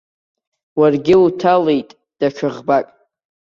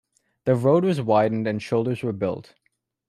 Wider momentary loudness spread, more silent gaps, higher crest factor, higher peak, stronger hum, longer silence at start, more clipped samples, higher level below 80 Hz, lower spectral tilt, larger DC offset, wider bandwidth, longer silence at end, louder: about the same, 10 LU vs 9 LU; neither; about the same, 14 dB vs 16 dB; first, -2 dBFS vs -6 dBFS; neither; first, 0.75 s vs 0.45 s; neither; first, -56 dBFS vs -64 dBFS; about the same, -7.5 dB/octave vs -8 dB/octave; neither; second, 7.2 kHz vs 13 kHz; about the same, 0.7 s vs 0.65 s; first, -16 LUFS vs -23 LUFS